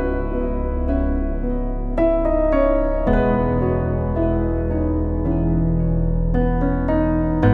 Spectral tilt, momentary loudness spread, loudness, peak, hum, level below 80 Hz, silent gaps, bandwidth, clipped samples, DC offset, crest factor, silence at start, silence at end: -11.5 dB/octave; 6 LU; -20 LUFS; -2 dBFS; none; -24 dBFS; none; 4 kHz; under 0.1%; under 0.1%; 16 dB; 0 s; 0 s